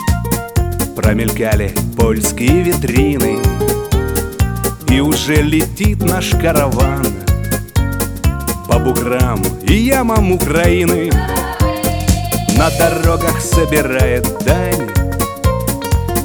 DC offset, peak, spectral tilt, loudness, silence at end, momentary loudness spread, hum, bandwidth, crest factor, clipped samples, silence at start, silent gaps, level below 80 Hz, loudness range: under 0.1%; 0 dBFS; -5.5 dB/octave; -14 LUFS; 0 s; 5 LU; none; over 20 kHz; 14 dB; under 0.1%; 0 s; none; -20 dBFS; 2 LU